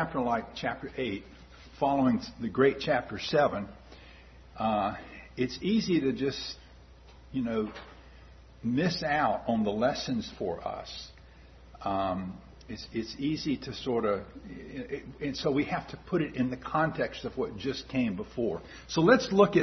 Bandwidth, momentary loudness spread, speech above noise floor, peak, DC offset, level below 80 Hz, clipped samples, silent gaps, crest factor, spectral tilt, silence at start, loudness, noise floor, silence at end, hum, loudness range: 6.4 kHz; 16 LU; 23 dB; -8 dBFS; under 0.1%; -54 dBFS; under 0.1%; none; 24 dB; -6 dB/octave; 0 s; -30 LUFS; -53 dBFS; 0 s; none; 5 LU